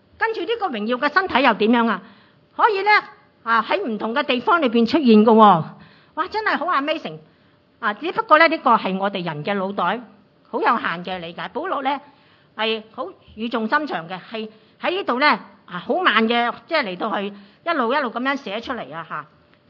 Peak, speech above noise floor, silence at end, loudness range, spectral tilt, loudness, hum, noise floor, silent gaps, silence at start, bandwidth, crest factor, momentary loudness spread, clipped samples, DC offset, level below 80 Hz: 0 dBFS; 36 dB; 0.45 s; 8 LU; -7 dB/octave; -20 LUFS; none; -56 dBFS; none; 0.2 s; 6 kHz; 20 dB; 17 LU; under 0.1%; under 0.1%; -68 dBFS